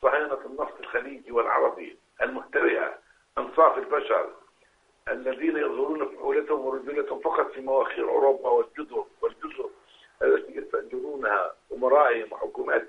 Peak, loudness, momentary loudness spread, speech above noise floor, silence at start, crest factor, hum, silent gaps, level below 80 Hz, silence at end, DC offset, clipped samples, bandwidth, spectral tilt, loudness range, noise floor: -6 dBFS; -26 LUFS; 13 LU; 38 dB; 0 s; 20 dB; none; none; -64 dBFS; 0 s; under 0.1%; under 0.1%; 5.8 kHz; -5.5 dB/octave; 3 LU; -64 dBFS